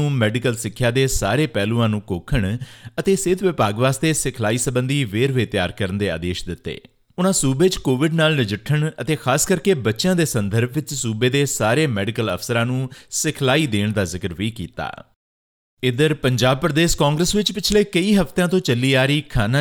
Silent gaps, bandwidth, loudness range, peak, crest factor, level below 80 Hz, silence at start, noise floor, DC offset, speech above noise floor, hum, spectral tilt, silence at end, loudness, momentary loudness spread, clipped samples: 15.16-15.77 s; 18.5 kHz; 4 LU; -2 dBFS; 18 dB; -38 dBFS; 0 s; under -90 dBFS; under 0.1%; over 71 dB; none; -5 dB/octave; 0 s; -20 LUFS; 8 LU; under 0.1%